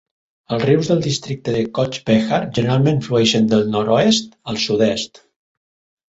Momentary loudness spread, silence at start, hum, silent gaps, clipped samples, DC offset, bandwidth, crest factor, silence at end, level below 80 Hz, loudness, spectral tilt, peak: 8 LU; 0.5 s; none; none; under 0.1%; under 0.1%; 8 kHz; 16 dB; 1.05 s; -52 dBFS; -17 LUFS; -5.5 dB/octave; -2 dBFS